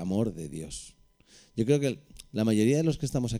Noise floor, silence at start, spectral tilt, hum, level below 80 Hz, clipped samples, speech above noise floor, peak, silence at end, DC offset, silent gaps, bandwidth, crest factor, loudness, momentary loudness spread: -59 dBFS; 0 s; -6.5 dB/octave; none; -52 dBFS; under 0.1%; 31 dB; -12 dBFS; 0 s; under 0.1%; none; 15.5 kHz; 18 dB; -28 LUFS; 16 LU